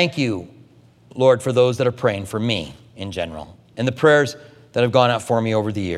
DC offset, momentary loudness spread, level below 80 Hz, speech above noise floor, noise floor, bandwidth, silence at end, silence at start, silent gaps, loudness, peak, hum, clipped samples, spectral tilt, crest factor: under 0.1%; 18 LU; -54 dBFS; 31 dB; -50 dBFS; 13 kHz; 0 s; 0 s; none; -19 LUFS; 0 dBFS; none; under 0.1%; -5.5 dB/octave; 20 dB